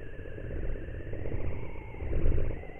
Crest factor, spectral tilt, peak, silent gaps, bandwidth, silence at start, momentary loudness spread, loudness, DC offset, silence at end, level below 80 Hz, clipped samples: 16 dB; -10 dB/octave; -14 dBFS; none; 3.1 kHz; 0 s; 10 LU; -38 LUFS; under 0.1%; 0 s; -32 dBFS; under 0.1%